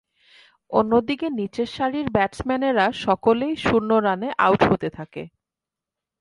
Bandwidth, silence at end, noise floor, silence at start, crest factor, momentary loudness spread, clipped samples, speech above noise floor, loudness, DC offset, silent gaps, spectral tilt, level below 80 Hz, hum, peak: 11.5 kHz; 0.9 s; -88 dBFS; 0.7 s; 20 dB; 9 LU; under 0.1%; 67 dB; -21 LUFS; under 0.1%; none; -6.5 dB/octave; -50 dBFS; none; -2 dBFS